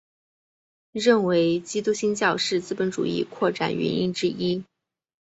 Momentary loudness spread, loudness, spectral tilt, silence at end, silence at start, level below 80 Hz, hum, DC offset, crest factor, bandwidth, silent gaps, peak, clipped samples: 7 LU; -24 LUFS; -5 dB/octave; 0.6 s; 0.95 s; -64 dBFS; none; under 0.1%; 18 dB; 8.2 kHz; none; -6 dBFS; under 0.1%